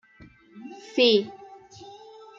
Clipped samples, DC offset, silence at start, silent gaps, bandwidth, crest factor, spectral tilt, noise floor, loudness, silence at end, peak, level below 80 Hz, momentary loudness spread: under 0.1%; under 0.1%; 0.55 s; none; 7.4 kHz; 20 dB; -4.5 dB/octave; -53 dBFS; -22 LUFS; 0.5 s; -8 dBFS; -68 dBFS; 26 LU